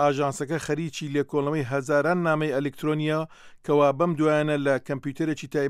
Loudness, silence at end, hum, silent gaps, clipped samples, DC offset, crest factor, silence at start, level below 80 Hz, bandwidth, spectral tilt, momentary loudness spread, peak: -25 LUFS; 0 s; none; none; under 0.1%; under 0.1%; 16 dB; 0 s; -64 dBFS; 14.5 kHz; -6.5 dB/octave; 7 LU; -8 dBFS